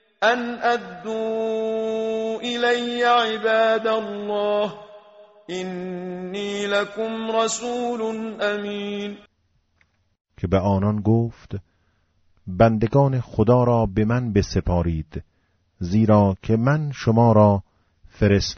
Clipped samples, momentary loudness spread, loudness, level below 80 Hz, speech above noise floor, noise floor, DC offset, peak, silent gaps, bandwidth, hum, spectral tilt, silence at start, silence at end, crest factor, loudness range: under 0.1%; 13 LU; -21 LUFS; -42 dBFS; 46 dB; -66 dBFS; under 0.1%; -2 dBFS; 10.21-10.25 s; 8 kHz; none; -5.5 dB/octave; 0.2 s; 0 s; 18 dB; 6 LU